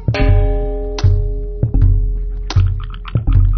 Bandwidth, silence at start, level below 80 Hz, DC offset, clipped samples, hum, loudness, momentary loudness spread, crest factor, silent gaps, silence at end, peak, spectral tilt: 6.4 kHz; 0 s; -16 dBFS; under 0.1%; under 0.1%; none; -17 LUFS; 8 LU; 12 dB; none; 0 s; -2 dBFS; -7 dB/octave